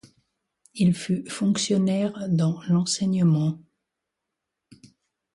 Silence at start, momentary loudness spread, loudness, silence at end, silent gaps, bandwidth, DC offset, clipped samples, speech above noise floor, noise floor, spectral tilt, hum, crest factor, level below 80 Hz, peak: 0.75 s; 7 LU; -24 LUFS; 1.75 s; none; 11.5 kHz; under 0.1%; under 0.1%; 61 dB; -83 dBFS; -6 dB/octave; none; 14 dB; -64 dBFS; -12 dBFS